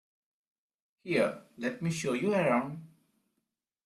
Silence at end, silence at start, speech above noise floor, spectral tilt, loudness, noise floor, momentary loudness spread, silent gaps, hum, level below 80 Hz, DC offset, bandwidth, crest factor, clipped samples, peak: 1 s; 1.05 s; 54 dB; -5.5 dB/octave; -31 LUFS; -84 dBFS; 14 LU; none; none; -74 dBFS; under 0.1%; 13.5 kHz; 18 dB; under 0.1%; -16 dBFS